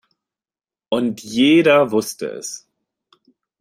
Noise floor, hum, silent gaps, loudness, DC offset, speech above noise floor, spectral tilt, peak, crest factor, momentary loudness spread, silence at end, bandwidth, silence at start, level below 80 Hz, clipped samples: under -90 dBFS; none; none; -17 LUFS; under 0.1%; over 73 dB; -4.5 dB/octave; -2 dBFS; 18 dB; 17 LU; 1.05 s; 16 kHz; 0.9 s; -66 dBFS; under 0.1%